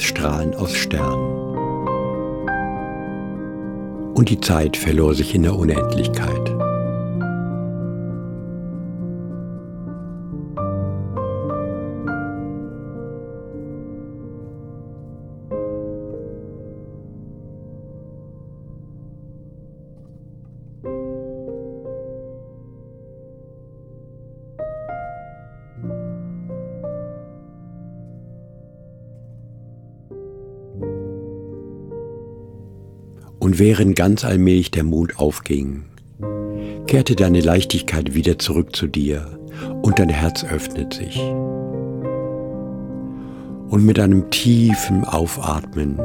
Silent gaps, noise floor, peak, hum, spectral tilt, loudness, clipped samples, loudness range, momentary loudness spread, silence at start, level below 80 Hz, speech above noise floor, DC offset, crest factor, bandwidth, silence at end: none; -42 dBFS; -2 dBFS; none; -6 dB/octave; -21 LUFS; under 0.1%; 18 LU; 25 LU; 0 s; -36 dBFS; 25 dB; under 0.1%; 20 dB; 18 kHz; 0 s